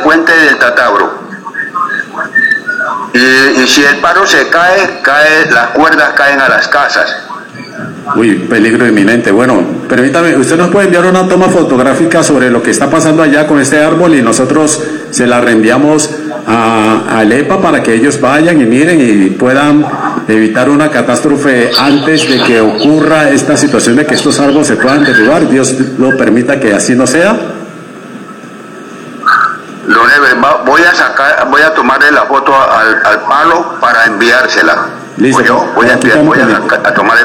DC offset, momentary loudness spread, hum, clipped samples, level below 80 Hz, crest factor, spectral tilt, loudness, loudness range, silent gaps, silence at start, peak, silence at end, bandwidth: under 0.1%; 9 LU; none; 0.9%; -46 dBFS; 8 dB; -4 dB/octave; -7 LUFS; 3 LU; none; 0 s; 0 dBFS; 0 s; 17.5 kHz